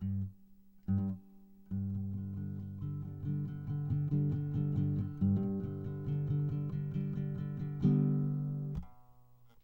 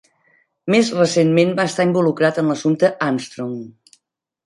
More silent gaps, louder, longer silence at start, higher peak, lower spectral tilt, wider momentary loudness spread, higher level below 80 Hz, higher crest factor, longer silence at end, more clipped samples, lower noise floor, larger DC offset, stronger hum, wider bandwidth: neither; second, -36 LUFS vs -17 LUFS; second, 0 s vs 0.65 s; second, -18 dBFS vs -2 dBFS; first, -12 dB/octave vs -5.5 dB/octave; second, 9 LU vs 13 LU; first, -56 dBFS vs -64 dBFS; about the same, 16 dB vs 16 dB; second, 0.55 s vs 0.75 s; neither; second, -63 dBFS vs -71 dBFS; neither; neither; second, 3.4 kHz vs 11.5 kHz